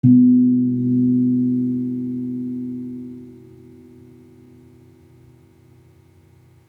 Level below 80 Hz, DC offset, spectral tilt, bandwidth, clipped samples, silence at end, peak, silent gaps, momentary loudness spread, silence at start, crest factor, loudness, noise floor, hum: -64 dBFS; under 0.1%; -12.5 dB/octave; 1 kHz; under 0.1%; 3.3 s; -4 dBFS; none; 21 LU; 0.05 s; 16 dB; -18 LUFS; -51 dBFS; none